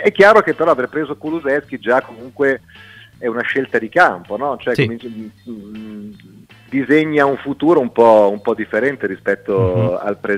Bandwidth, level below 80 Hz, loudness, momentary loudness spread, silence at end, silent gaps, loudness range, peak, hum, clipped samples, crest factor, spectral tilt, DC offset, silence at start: 13.5 kHz; -54 dBFS; -16 LUFS; 21 LU; 0 s; none; 5 LU; 0 dBFS; none; under 0.1%; 16 dB; -7 dB/octave; under 0.1%; 0 s